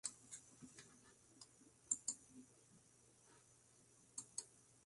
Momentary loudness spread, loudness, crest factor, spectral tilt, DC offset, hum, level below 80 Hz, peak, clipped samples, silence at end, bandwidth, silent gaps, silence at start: 25 LU; -49 LUFS; 30 dB; -0.5 dB/octave; under 0.1%; none; -88 dBFS; -26 dBFS; under 0.1%; 0 s; 11.5 kHz; none; 0.05 s